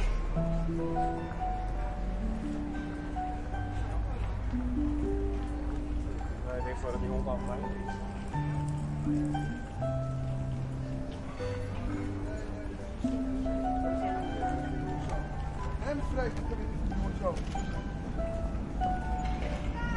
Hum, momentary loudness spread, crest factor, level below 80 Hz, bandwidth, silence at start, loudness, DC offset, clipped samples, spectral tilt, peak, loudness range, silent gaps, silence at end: none; 5 LU; 14 dB; -36 dBFS; 11 kHz; 0 s; -35 LUFS; under 0.1%; under 0.1%; -7.5 dB/octave; -18 dBFS; 2 LU; none; 0 s